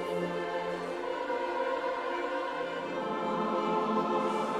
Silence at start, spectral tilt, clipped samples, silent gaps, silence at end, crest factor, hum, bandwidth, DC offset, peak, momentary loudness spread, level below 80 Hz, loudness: 0 s; -5.5 dB/octave; under 0.1%; none; 0 s; 14 dB; none; 13 kHz; under 0.1%; -18 dBFS; 5 LU; -68 dBFS; -32 LUFS